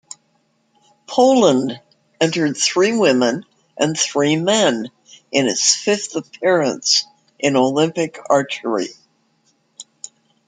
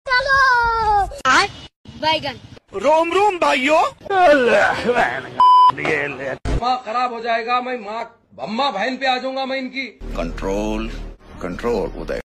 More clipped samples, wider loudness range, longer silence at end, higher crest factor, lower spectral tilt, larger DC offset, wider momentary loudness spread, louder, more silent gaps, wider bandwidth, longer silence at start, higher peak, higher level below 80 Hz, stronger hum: neither; second, 2 LU vs 8 LU; first, 0.65 s vs 0.15 s; about the same, 18 dB vs 14 dB; about the same, -3 dB/octave vs -4 dB/octave; neither; about the same, 14 LU vs 15 LU; about the same, -17 LUFS vs -18 LUFS; second, none vs 1.76-1.84 s; second, 9.6 kHz vs 12.5 kHz; first, 1.1 s vs 0.05 s; first, 0 dBFS vs -4 dBFS; second, -66 dBFS vs -36 dBFS; neither